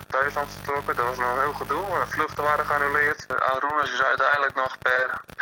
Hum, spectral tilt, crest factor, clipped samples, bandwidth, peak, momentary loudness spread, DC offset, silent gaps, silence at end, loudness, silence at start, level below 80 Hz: none; -4 dB/octave; 18 dB; under 0.1%; 17 kHz; -8 dBFS; 6 LU; under 0.1%; none; 0 s; -24 LUFS; 0 s; -52 dBFS